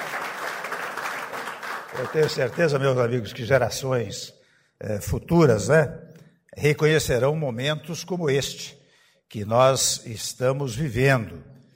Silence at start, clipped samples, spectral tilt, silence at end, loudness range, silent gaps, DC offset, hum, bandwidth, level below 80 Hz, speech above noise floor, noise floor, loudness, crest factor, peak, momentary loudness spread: 0 s; under 0.1%; -4.5 dB/octave; 0.2 s; 2 LU; none; under 0.1%; none; 16 kHz; -48 dBFS; 37 dB; -60 dBFS; -23 LUFS; 18 dB; -6 dBFS; 13 LU